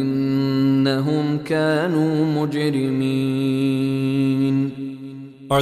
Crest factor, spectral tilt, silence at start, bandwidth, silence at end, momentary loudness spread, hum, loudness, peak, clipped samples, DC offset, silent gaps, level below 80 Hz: 14 dB; -7.5 dB/octave; 0 s; 13 kHz; 0 s; 7 LU; none; -20 LUFS; -6 dBFS; under 0.1%; under 0.1%; none; -58 dBFS